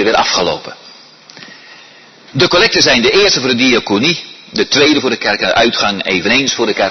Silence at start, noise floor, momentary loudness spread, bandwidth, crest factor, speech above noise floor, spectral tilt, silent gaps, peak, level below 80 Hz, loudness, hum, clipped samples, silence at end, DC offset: 0 s; -40 dBFS; 10 LU; 6.4 kHz; 14 dB; 28 dB; -3 dB/octave; none; 0 dBFS; -44 dBFS; -11 LUFS; none; under 0.1%; 0 s; under 0.1%